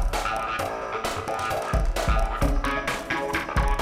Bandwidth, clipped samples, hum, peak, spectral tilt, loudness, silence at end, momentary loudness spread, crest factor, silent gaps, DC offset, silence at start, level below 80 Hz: 15.5 kHz; under 0.1%; none; -10 dBFS; -4.5 dB/octave; -27 LUFS; 0 s; 3 LU; 16 dB; none; under 0.1%; 0 s; -28 dBFS